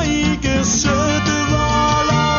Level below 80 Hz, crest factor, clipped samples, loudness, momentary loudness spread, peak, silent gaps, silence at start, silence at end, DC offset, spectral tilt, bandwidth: -28 dBFS; 12 dB; under 0.1%; -16 LUFS; 2 LU; -4 dBFS; none; 0 s; 0 s; under 0.1%; -4 dB/octave; 7.2 kHz